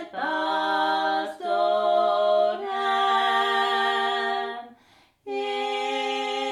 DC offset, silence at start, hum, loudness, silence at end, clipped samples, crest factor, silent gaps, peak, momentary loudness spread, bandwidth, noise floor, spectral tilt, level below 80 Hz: under 0.1%; 0 s; none; -24 LUFS; 0 s; under 0.1%; 14 dB; none; -12 dBFS; 7 LU; 12.5 kHz; -59 dBFS; -2 dB/octave; -78 dBFS